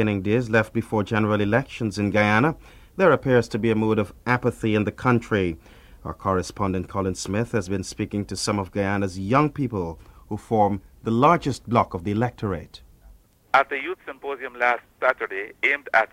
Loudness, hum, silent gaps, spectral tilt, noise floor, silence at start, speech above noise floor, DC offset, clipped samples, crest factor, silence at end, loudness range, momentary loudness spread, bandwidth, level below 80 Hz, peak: -23 LUFS; none; none; -6 dB/octave; -52 dBFS; 0 s; 29 dB; under 0.1%; under 0.1%; 20 dB; 0.05 s; 4 LU; 11 LU; 15.5 kHz; -48 dBFS; -4 dBFS